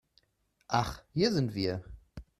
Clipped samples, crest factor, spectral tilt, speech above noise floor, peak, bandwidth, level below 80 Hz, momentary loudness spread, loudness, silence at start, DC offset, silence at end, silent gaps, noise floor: under 0.1%; 22 dB; -6 dB/octave; 44 dB; -10 dBFS; 14 kHz; -54 dBFS; 17 LU; -32 LUFS; 0.7 s; under 0.1%; 0.15 s; none; -75 dBFS